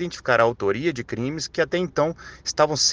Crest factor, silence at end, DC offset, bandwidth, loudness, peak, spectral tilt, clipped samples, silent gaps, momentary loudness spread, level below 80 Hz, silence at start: 20 dB; 0 s; under 0.1%; 10.5 kHz; -23 LUFS; -4 dBFS; -3.5 dB/octave; under 0.1%; none; 9 LU; -52 dBFS; 0 s